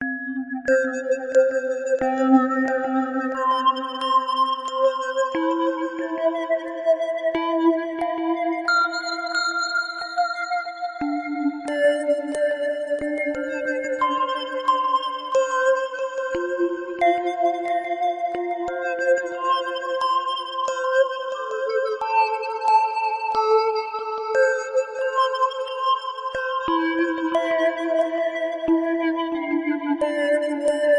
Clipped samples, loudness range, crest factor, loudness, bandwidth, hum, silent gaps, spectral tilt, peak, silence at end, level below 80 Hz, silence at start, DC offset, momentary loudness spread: under 0.1%; 3 LU; 18 dB; -23 LUFS; 10.5 kHz; none; none; -3 dB/octave; -4 dBFS; 0 s; -62 dBFS; 0 s; under 0.1%; 6 LU